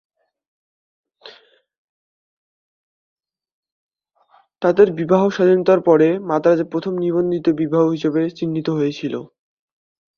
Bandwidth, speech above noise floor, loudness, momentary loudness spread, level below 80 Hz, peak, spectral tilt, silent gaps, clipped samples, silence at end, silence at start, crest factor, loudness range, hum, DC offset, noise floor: 6.8 kHz; 41 dB; -17 LUFS; 8 LU; -62 dBFS; 0 dBFS; -8 dB/octave; 1.78-3.16 s, 3.52-3.63 s, 3.72-3.89 s; under 0.1%; 0.9 s; 1.25 s; 20 dB; 5 LU; none; under 0.1%; -58 dBFS